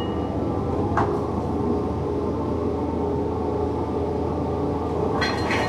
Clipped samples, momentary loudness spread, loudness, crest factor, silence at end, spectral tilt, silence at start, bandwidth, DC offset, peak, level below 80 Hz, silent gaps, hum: under 0.1%; 3 LU; -25 LUFS; 18 dB; 0 s; -7 dB/octave; 0 s; 11.5 kHz; under 0.1%; -6 dBFS; -38 dBFS; none; none